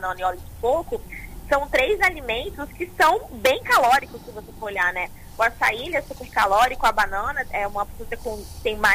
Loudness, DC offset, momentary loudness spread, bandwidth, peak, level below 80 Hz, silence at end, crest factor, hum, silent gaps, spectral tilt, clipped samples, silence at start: -22 LUFS; under 0.1%; 14 LU; 16 kHz; -8 dBFS; -40 dBFS; 0 s; 16 dB; none; none; -3 dB/octave; under 0.1%; 0 s